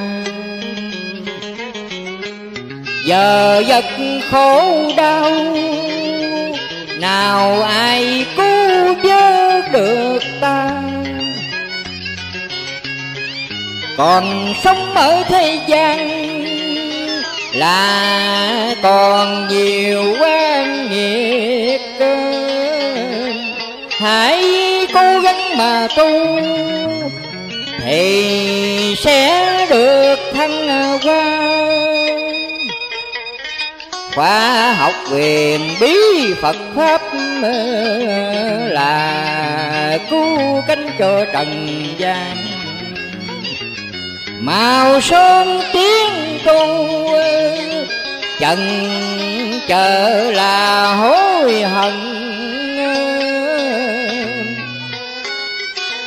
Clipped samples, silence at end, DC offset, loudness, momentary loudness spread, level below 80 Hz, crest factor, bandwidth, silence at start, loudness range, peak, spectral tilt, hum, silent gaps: under 0.1%; 0 s; under 0.1%; -14 LUFS; 12 LU; -52 dBFS; 14 dB; 16 kHz; 0 s; 5 LU; 0 dBFS; -3.5 dB/octave; none; none